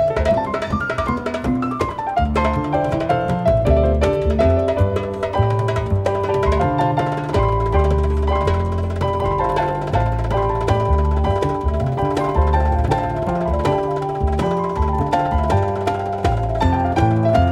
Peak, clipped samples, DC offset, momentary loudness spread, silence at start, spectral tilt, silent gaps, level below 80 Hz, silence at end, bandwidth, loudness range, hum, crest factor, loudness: -2 dBFS; under 0.1%; under 0.1%; 5 LU; 0 s; -8 dB/octave; none; -24 dBFS; 0 s; 10.5 kHz; 2 LU; none; 16 dB; -19 LUFS